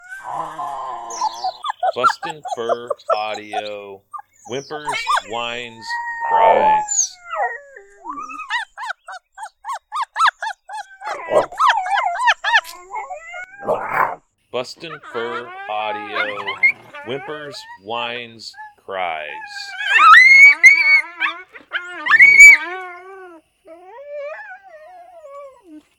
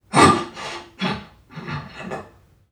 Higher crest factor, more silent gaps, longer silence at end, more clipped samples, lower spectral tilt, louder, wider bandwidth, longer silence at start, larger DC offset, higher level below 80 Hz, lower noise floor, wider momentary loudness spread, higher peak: about the same, 18 dB vs 22 dB; neither; second, 0.2 s vs 0.45 s; first, 0.1% vs under 0.1%; second, -0.5 dB/octave vs -4.5 dB/octave; first, -13 LUFS vs -22 LUFS; first, 19 kHz vs 15.5 kHz; about the same, 0.1 s vs 0.1 s; neither; second, -60 dBFS vs -52 dBFS; second, -44 dBFS vs -49 dBFS; first, 24 LU vs 20 LU; about the same, 0 dBFS vs 0 dBFS